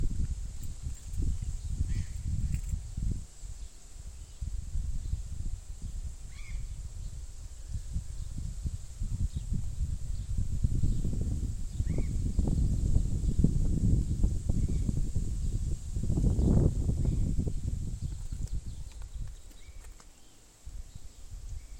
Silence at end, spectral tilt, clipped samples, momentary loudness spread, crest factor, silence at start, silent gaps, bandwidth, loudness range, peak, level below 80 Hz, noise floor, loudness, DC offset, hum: 0 s; -7.5 dB/octave; under 0.1%; 18 LU; 22 dB; 0 s; none; 11 kHz; 11 LU; -10 dBFS; -34 dBFS; -54 dBFS; -34 LUFS; under 0.1%; none